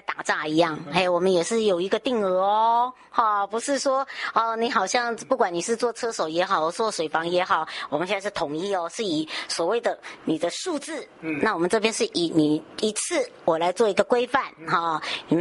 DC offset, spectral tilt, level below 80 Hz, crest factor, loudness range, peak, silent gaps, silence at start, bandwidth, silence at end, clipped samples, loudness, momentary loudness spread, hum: under 0.1%; -3.5 dB/octave; -66 dBFS; 18 dB; 4 LU; -6 dBFS; none; 0.1 s; 11.5 kHz; 0 s; under 0.1%; -24 LUFS; 6 LU; none